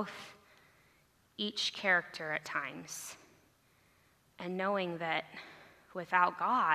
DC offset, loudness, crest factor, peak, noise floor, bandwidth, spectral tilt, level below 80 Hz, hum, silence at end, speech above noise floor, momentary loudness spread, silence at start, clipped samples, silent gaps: under 0.1%; -34 LUFS; 22 dB; -14 dBFS; -69 dBFS; 14 kHz; -3 dB/octave; -82 dBFS; none; 0 s; 34 dB; 19 LU; 0 s; under 0.1%; none